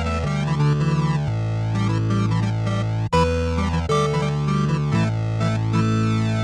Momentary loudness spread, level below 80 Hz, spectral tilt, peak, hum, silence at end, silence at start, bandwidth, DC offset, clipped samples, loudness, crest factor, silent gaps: 3 LU; -36 dBFS; -7 dB/octave; -6 dBFS; none; 0 s; 0 s; 10 kHz; under 0.1%; under 0.1%; -21 LUFS; 14 dB; none